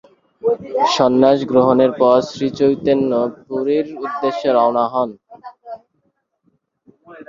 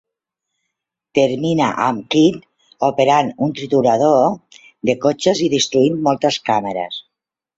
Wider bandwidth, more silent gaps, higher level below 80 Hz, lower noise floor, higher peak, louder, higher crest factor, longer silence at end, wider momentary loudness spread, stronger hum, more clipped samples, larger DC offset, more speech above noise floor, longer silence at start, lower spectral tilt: about the same, 7.6 kHz vs 8 kHz; neither; about the same, -58 dBFS vs -58 dBFS; second, -67 dBFS vs -82 dBFS; about the same, 0 dBFS vs -2 dBFS; about the same, -16 LUFS vs -17 LUFS; about the same, 16 dB vs 16 dB; second, 0.05 s vs 0.55 s; about the same, 11 LU vs 10 LU; neither; neither; neither; second, 51 dB vs 67 dB; second, 0.45 s vs 1.15 s; about the same, -6 dB/octave vs -5 dB/octave